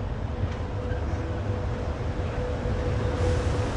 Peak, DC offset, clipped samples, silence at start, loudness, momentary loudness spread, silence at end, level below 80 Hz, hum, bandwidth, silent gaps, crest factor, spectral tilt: -14 dBFS; under 0.1%; under 0.1%; 0 s; -29 LUFS; 5 LU; 0 s; -34 dBFS; none; 10.5 kHz; none; 14 dB; -7 dB/octave